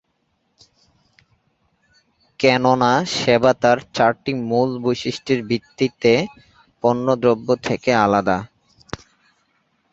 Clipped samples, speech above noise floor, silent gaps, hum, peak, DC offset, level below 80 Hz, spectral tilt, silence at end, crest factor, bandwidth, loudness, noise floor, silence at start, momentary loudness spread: under 0.1%; 51 dB; none; none; -2 dBFS; under 0.1%; -54 dBFS; -5.5 dB/octave; 1.45 s; 18 dB; 8 kHz; -18 LUFS; -69 dBFS; 2.4 s; 9 LU